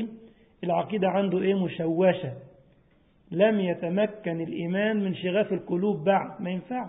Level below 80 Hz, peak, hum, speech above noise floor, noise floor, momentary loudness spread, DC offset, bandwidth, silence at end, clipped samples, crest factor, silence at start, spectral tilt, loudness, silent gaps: -66 dBFS; -8 dBFS; none; 36 dB; -61 dBFS; 9 LU; under 0.1%; 4 kHz; 0 s; under 0.1%; 18 dB; 0 s; -11 dB/octave; -26 LUFS; none